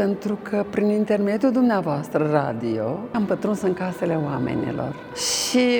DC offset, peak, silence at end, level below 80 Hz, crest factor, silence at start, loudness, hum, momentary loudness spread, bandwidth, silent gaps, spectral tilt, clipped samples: under 0.1%; -4 dBFS; 0 s; -58 dBFS; 18 dB; 0 s; -23 LUFS; none; 6 LU; over 20 kHz; none; -5 dB/octave; under 0.1%